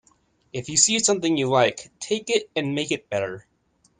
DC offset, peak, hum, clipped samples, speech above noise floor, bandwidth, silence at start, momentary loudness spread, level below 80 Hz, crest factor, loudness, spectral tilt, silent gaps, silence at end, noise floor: under 0.1%; -4 dBFS; none; under 0.1%; 42 dB; 10 kHz; 0.55 s; 16 LU; -64 dBFS; 22 dB; -22 LUFS; -2.5 dB/octave; none; 0.6 s; -65 dBFS